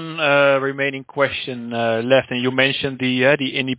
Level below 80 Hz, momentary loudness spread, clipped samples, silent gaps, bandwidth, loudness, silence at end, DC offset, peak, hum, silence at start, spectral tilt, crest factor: -58 dBFS; 8 LU; under 0.1%; none; 4 kHz; -18 LUFS; 0 s; under 0.1%; -2 dBFS; none; 0 s; -9 dB/octave; 18 dB